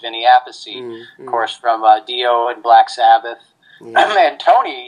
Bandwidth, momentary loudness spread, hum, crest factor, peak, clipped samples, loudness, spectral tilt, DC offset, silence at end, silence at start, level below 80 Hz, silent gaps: 10 kHz; 17 LU; none; 14 dB; 0 dBFS; under 0.1%; -13 LUFS; -2 dB/octave; under 0.1%; 0 s; 0.05 s; -76 dBFS; none